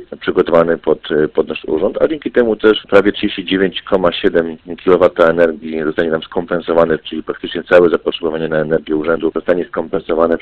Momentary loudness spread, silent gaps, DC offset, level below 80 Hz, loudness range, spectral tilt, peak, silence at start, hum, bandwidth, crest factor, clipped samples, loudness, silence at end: 8 LU; none; under 0.1%; -42 dBFS; 2 LU; -7.5 dB/octave; 0 dBFS; 0 s; none; 5.4 kHz; 14 dB; under 0.1%; -15 LUFS; 0 s